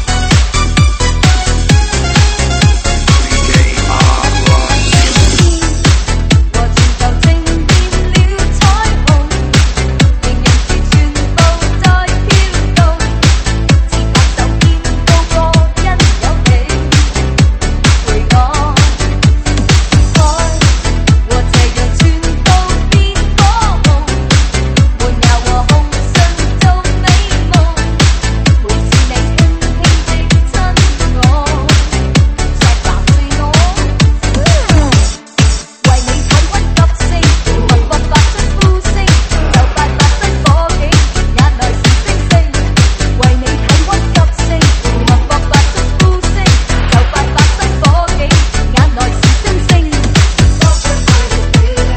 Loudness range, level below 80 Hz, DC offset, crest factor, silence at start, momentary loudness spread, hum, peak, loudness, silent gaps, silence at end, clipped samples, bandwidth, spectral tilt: 1 LU; -12 dBFS; 0.3%; 8 dB; 0 s; 2 LU; none; 0 dBFS; -10 LUFS; none; 0 s; 0.6%; 8.8 kHz; -4.5 dB/octave